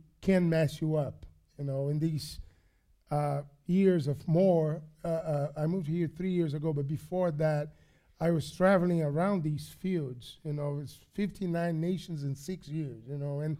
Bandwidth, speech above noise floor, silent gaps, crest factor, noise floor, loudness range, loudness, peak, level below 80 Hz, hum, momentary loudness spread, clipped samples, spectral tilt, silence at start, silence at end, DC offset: 15 kHz; 36 dB; none; 18 dB; -67 dBFS; 5 LU; -31 LUFS; -14 dBFS; -58 dBFS; none; 12 LU; under 0.1%; -8 dB/octave; 0.2 s; 0 s; under 0.1%